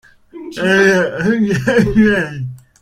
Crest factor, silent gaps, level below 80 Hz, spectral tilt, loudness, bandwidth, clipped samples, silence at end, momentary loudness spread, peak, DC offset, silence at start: 14 dB; none; -38 dBFS; -6 dB/octave; -14 LUFS; 15.5 kHz; under 0.1%; 0.25 s; 17 LU; 0 dBFS; under 0.1%; 0.35 s